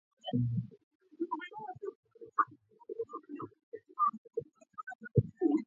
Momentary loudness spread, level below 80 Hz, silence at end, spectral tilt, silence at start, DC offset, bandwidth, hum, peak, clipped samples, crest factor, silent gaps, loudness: 16 LU; -60 dBFS; 0 s; -9.5 dB/octave; 0.25 s; under 0.1%; 7.2 kHz; none; -14 dBFS; under 0.1%; 24 dB; 0.83-1.00 s, 1.95-2.03 s, 3.63-3.72 s, 4.18-4.25 s, 4.95-4.99 s; -37 LUFS